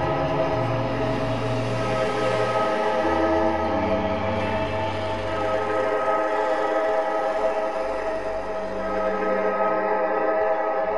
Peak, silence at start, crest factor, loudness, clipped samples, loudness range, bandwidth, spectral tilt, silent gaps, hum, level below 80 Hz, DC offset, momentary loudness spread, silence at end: -10 dBFS; 0 s; 14 dB; -24 LUFS; under 0.1%; 1 LU; 11 kHz; -6.5 dB/octave; none; none; -46 dBFS; 1%; 4 LU; 0 s